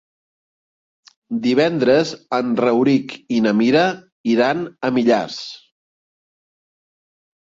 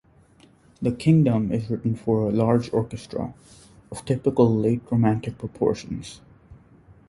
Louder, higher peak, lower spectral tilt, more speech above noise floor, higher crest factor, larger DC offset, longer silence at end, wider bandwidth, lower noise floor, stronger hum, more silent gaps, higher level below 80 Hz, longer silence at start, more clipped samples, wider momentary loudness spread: first, -18 LUFS vs -23 LUFS; about the same, -4 dBFS vs -4 dBFS; second, -6 dB/octave vs -8.5 dB/octave; first, over 73 dB vs 32 dB; about the same, 16 dB vs 20 dB; neither; first, 2 s vs 0.55 s; second, 7.8 kHz vs 11.5 kHz; first, under -90 dBFS vs -55 dBFS; neither; first, 4.12-4.24 s vs none; second, -62 dBFS vs -50 dBFS; first, 1.3 s vs 0.8 s; neither; second, 10 LU vs 15 LU